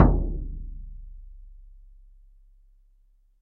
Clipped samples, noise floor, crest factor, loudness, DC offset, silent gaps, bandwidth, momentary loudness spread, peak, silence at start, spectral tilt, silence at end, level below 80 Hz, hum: under 0.1%; -60 dBFS; 26 dB; -30 LUFS; under 0.1%; none; 2.2 kHz; 25 LU; -2 dBFS; 0 s; -11 dB/octave; 1.9 s; -32 dBFS; none